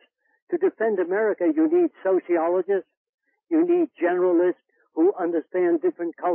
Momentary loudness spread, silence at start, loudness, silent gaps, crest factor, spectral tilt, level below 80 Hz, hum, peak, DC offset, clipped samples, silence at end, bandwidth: 6 LU; 0.5 s; -23 LUFS; 2.97-3.18 s; 12 dB; -11 dB/octave; -88 dBFS; none; -12 dBFS; under 0.1%; under 0.1%; 0 s; 3.2 kHz